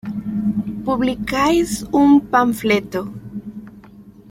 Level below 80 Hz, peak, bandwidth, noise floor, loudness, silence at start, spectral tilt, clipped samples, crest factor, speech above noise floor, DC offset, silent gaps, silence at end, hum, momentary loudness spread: -44 dBFS; -2 dBFS; 16.5 kHz; -42 dBFS; -18 LUFS; 0.05 s; -5.5 dB/octave; under 0.1%; 16 dB; 26 dB; under 0.1%; none; 0.2 s; none; 19 LU